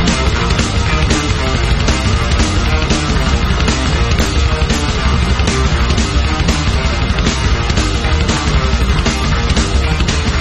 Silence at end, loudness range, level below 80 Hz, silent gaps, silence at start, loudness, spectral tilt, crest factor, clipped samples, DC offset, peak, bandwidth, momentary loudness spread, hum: 0 s; 0 LU; -16 dBFS; none; 0 s; -14 LUFS; -4.5 dB/octave; 12 dB; under 0.1%; under 0.1%; 0 dBFS; 11.5 kHz; 1 LU; none